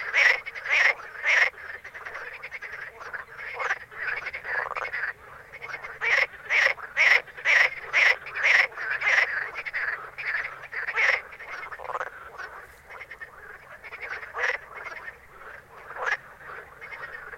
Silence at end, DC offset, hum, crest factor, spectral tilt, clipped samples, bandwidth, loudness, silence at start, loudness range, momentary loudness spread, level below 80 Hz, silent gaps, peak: 0 s; under 0.1%; none; 22 dB; 0 dB/octave; under 0.1%; 16.5 kHz; -24 LUFS; 0 s; 14 LU; 22 LU; -64 dBFS; none; -6 dBFS